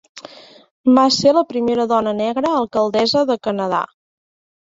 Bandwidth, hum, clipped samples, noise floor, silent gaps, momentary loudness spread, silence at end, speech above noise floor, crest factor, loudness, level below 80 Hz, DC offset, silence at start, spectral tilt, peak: 7.8 kHz; none; under 0.1%; -41 dBFS; 0.71-0.84 s; 9 LU; 0.85 s; 25 dB; 18 dB; -17 LUFS; -58 dBFS; under 0.1%; 0.15 s; -4.5 dB/octave; 0 dBFS